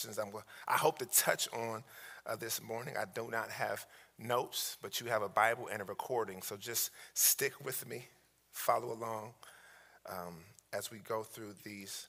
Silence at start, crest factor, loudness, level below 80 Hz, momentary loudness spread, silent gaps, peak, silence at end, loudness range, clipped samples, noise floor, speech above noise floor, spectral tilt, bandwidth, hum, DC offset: 0 s; 24 dB; -36 LUFS; -82 dBFS; 19 LU; none; -14 dBFS; 0 s; 7 LU; under 0.1%; -61 dBFS; 23 dB; -1.5 dB/octave; 16 kHz; none; under 0.1%